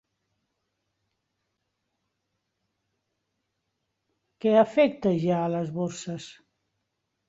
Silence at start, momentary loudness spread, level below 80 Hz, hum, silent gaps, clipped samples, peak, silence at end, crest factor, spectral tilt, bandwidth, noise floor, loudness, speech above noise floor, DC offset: 4.45 s; 16 LU; -70 dBFS; none; none; under 0.1%; -8 dBFS; 1 s; 22 dB; -6.5 dB/octave; 8 kHz; -80 dBFS; -25 LUFS; 56 dB; under 0.1%